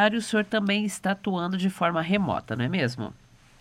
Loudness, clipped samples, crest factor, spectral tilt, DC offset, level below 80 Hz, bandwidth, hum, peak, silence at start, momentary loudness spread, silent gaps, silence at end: -26 LUFS; under 0.1%; 16 dB; -5.5 dB/octave; under 0.1%; -60 dBFS; 14 kHz; none; -10 dBFS; 0 s; 4 LU; none; 0.45 s